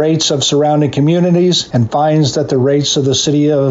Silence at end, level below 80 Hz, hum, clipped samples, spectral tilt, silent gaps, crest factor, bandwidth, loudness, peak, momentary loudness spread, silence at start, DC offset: 0 s; -48 dBFS; none; under 0.1%; -5 dB/octave; none; 8 dB; 8 kHz; -12 LUFS; -4 dBFS; 2 LU; 0 s; under 0.1%